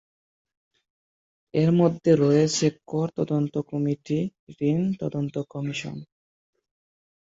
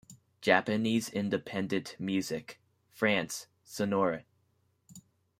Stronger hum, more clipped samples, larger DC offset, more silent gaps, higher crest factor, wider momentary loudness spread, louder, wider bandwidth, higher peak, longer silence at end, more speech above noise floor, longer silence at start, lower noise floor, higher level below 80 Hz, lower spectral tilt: neither; neither; neither; first, 4.39-4.47 s vs none; second, 18 dB vs 24 dB; about the same, 11 LU vs 13 LU; first, -25 LUFS vs -32 LUFS; second, 8 kHz vs 16 kHz; about the same, -8 dBFS vs -10 dBFS; first, 1.25 s vs 0.4 s; first, over 66 dB vs 42 dB; first, 1.55 s vs 0.1 s; first, under -90 dBFS vs -73 dBFS; first, -64 dBFS vs -72 dBFS; first, -6.5 dB/octave vs -4.5 dB/octave